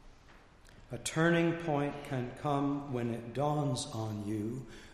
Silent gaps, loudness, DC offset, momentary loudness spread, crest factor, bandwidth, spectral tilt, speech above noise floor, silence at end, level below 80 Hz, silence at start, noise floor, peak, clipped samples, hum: none; -34 LUFS; under 0.1%; 10 LU; 18 dB; 14 kHz; -6 dB/octave; 24 dB; 0 s; -58 dBFS; 0.05 s; -58 dBFS; -16 dBFS; under 0.1%; none